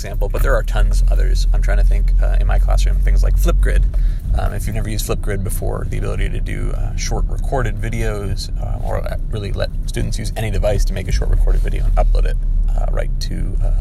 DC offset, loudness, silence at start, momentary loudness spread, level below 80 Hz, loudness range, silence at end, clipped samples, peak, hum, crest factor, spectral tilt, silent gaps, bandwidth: under 0.1%; -20 LUFS; 0 s; 6 LU; -16 dBFS; 5 LU; 0 s; under 0.1%; -2 dBFS; none; 14 dB; -5.5 dB/octave; none; 13 kHz